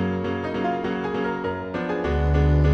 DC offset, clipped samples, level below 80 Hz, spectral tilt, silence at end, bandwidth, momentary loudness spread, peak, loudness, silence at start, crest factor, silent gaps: under 0.1%; under 0.1%; -28 dBFS; -8.5 dB/octave; 0 s; 6.4 kHz; 8 LU; -8 dBFS; -24 LUFS; 0 s; 14 dB; none